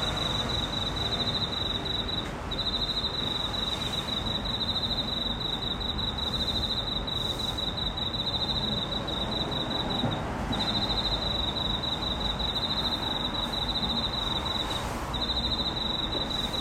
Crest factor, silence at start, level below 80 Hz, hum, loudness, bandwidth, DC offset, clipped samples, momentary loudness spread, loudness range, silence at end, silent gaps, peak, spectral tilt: 14 dB; 0 s; -40 dBFS; none; -28 LUFS; 16 kHz; under 0.1%; under 0.1%; 2 LU; 1 LU; 0 s; none; -16 dBFS; -4.5 dB/octave